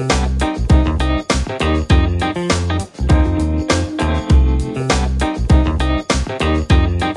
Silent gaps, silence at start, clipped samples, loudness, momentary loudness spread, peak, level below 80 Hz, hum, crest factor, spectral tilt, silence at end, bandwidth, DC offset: none; 0 s; under 0.1%; -16 LUFS; 5 LU; -2 dBFS; -18 dBFS; none; 12 dB; -5.5 dB/octave; 0 s; 11.5 kHz; under 0.1%